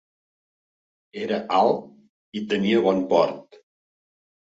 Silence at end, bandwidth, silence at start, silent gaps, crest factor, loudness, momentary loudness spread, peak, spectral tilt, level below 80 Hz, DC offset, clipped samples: 1 s; 7.8 kHz; 1.15 s; 2.09-2.32 s; 20 dB; -22 LUFS; 15 LU; -6 dBFS; -6.5 dB/octave; -66 dBFS; under 0.1%; under 0.1%